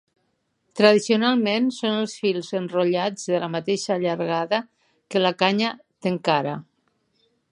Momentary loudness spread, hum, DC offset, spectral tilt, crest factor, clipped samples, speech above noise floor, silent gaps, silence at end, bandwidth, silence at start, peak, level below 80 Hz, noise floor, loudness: 8 LU; none; under 0.1%; -5 dB/octave; 20 dB; under 0.1%; 50 dB; none; 0.9 s; 11 kHz; 0.75 s; -2 dBFS; -74 dBFS; -71 dBFS; -22 LUFS